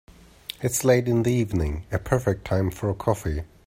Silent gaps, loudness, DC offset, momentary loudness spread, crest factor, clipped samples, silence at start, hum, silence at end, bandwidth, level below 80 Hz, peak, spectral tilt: none; -24 LUFS; under 0.1%; 10 LU; 18 dB; under 0.1%; 0.6 s; none; 0.2 s; 16 kHz; -40 dBFS; -6 dBFS; -6 dB/octave